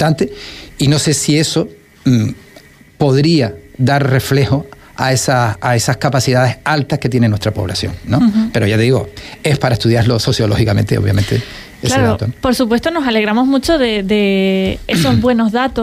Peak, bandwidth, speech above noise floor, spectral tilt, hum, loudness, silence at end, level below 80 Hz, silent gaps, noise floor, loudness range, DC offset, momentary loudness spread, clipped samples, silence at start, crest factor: -2 dBFS; 15.5 kHz; 28 dB; -5.5 dB/octave; none; -14 LUFS; 0 s; -36 dBFS; none; -41 dBFS; 1 LU; under 0.1%; 7 LU; under 0.1%; 0 s; 12 dB